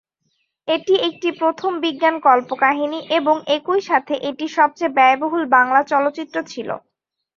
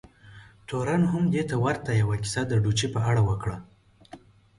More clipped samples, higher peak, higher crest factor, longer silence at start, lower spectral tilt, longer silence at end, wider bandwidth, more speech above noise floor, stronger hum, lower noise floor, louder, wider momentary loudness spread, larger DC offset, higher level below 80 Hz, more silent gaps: neither; first, -2 dBFS vs -12 dBFS; about the same, 18 dB vs 14 dB; first, 0.65 s vs 0.25 s; second, -3.5 dB/octave vs -6 dB/octave; first, 0.6 s vs 0.4 s; second, 7.4 kHz vs 11.5 kHz; first, 52 dB vs 25 dB; neither; first, -70 dBFS vs -50 dBFS; first, -18 LUFS vs -26 LUFS; about the same, 12 LU vs 10 LU; neither; second, -70 dBFS vs -48 dBFS; neither